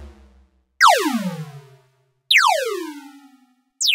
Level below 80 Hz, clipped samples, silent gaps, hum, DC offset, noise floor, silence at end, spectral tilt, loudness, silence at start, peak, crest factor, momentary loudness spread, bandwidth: -54 dBFS; under 0.1%; none; none; under 0.1%; -62 dBFS; 0 s; -2 dB/octave; -17 LUFS; 0 s; -2 dBFS; 20 dB; 20 LU; 16 kHz